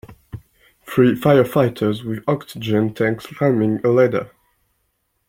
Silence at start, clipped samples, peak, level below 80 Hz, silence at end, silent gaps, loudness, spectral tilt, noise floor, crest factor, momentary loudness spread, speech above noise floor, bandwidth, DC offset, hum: 0.1 s; under 0.1%; -2 dBFS; -54 dBFS; 1.05 s; none; -18 LUFS; -7.5 dB/octave; -69 dBFS; 18 dB; 23 LU; 52 dB; 16.5 kHz; under 0.1%; none